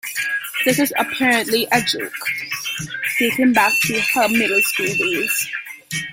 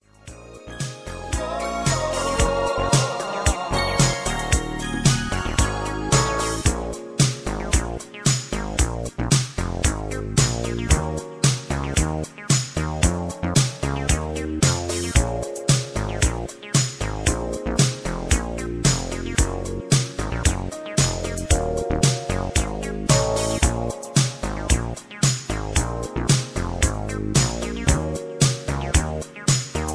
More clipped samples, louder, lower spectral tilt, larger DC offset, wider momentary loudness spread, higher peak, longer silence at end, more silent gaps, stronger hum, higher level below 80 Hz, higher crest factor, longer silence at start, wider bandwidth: neither; first, -18 LUFS vs -23 LUFS; second, -2.5 dB/octave vs -4 dB/octave; neither; about the same, 9 LU vs 8 LU; about the same, -2 dBFS vs -2 dBFS; about the same, 0 s vs 0 s; neither; neither; second, -58 dBFS vs -30 dBFS; about the same, 18 dB vs 20 dB; second, 0.05 s vs 0.25 s; first, 17 kHz vs 11 kHz